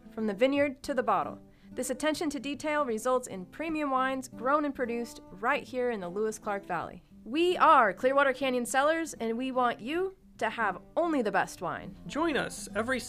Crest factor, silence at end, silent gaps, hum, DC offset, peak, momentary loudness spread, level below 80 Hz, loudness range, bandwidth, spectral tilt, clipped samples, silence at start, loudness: 20 dB; 0 s; none; none; under 0.1%; -10 dBFS; 11 LU; -60 dBFS; 5 LU; 15.5 kHz; -4 dB/octave; under 0.1%; 0.05 s; -30 LUFS